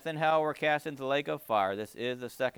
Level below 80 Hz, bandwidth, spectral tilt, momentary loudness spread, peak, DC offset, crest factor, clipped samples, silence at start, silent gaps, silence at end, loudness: -76 dBFS; over 20 kHz; -5 dB/octave; 8 LU; -16 dBFS; under 0.1%; 16 dB; under 0.1%; 0.05 s; none; 0.05 s; -31 LUFS